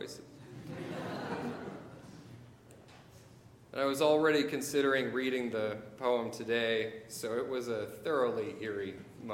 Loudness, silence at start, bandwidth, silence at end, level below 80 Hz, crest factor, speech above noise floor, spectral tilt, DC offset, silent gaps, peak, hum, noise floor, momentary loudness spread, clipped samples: -34 LUFS; 0 s; 17 kHz; 0 s; -72 dBFS; 20 dB; 24 dB; -4.5 dB/octave; under 0.1%; none; -16 dBFS; none; -57 dBFS; 20 LU; under 0.1%